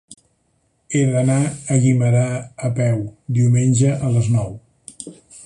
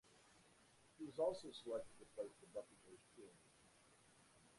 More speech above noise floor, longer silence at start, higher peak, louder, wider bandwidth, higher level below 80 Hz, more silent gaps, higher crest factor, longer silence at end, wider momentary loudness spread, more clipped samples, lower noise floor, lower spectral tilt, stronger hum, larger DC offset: first, 48 dB vs 22 dB; about the same, 0.1 s vs 0.05 s; first, -2 dBFS vs -30 dBFS; first, -18 LUFS vs -49 LUFS; about the same, 11 kHz vs 11.5 kHz; first, -50 dBFS vs -84 dBFS; neither; second, 16 dB vs 22 dB; about the same, 0.05 s vs 0.05 s; second, 18 LU vs 25 LU; neither; second, -65 dBFS vs -72 dBFS; first, -7 dB/octave vs -4.5 dB/octave; neither; neither